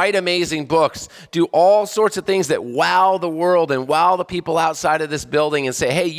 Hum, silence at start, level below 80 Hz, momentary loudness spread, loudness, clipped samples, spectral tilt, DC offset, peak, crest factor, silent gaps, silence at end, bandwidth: none; 0 s; -52 dBFS; 6 LU; -18 LUFS; under 0.1%; -4 dB/octave; under 0.1%; -4 dBFS; 14 dB; none; 0 s; 16 kHz